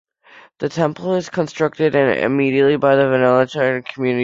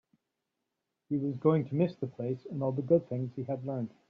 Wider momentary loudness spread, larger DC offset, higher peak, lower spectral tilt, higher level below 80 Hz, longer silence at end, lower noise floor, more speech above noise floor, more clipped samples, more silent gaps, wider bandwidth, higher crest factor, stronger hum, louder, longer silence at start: about the same, 7 LU vs 9 LU; neither; first, -2 dBFS vs -14 dBFS; second, -6.5 dB/octave vs -10 dB/octave; first, -58 dBFS vs -72 dBFS; second, 0 s vs 0.2 s; second, -47 dBFS vs -85 dBFS; second, 31 dB vs 54 dB; neither; neither; first, 7.8 kHz vs 5.2 kHz; second, 14 dB vs 20 dB; neither; first, -17 LUFS vs -32 LUFS; second, 0.6 s vs 1.1 s